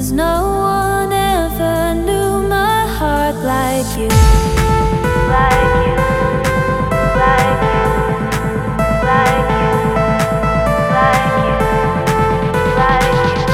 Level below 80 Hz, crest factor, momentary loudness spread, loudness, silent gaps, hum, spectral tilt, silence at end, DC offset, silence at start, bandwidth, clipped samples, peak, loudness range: -22 dBFS; 12 dB; 4 LU; -14 LUFS; none; none; -5.5 dB/octave; 0 s; 0.2%; 0 s; 16.5 kHz; under 0.1%; 0 dBFS; 2 LU